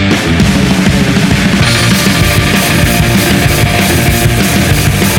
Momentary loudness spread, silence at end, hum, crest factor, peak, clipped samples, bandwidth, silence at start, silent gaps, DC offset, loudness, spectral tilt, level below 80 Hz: 1 LU; 0 s; none; 8 dB; 0 dBFS; 0.1%; 19 kHz; 0 s; none; under 0.1%; -8 LUFS; -4.5 dB/octave; -20 dBFS